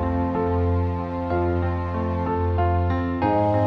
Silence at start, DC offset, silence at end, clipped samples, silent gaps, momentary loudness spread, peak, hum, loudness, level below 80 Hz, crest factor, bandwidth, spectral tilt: 0 s; under 0.1%; 0 s; under 0.1%; none; 4 LU; -10 dBFS; none; -23 LUFS; -36 dBFS; 12 dB; 4.8 kHz; -10.5 dB/octave